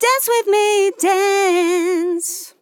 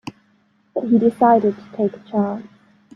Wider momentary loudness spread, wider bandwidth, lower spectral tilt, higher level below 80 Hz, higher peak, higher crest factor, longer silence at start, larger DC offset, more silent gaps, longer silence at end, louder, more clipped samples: second, 6 LU vs 15 LU; first, 19 kHz vs 6.8 kHz; second, 0 dB/octave vs -9 dB/octave; second, under -90 dBFS vs -64 dBFS; about the same, -4 dBFS vs -2 dBFS; about the same, 14 dB vs 18 dB; about the same, 0 s vs 0.05 s; neither; neither; second, 0.1 s vs 0.55 s; first, -16 LUFS vs -19 LUFS; neither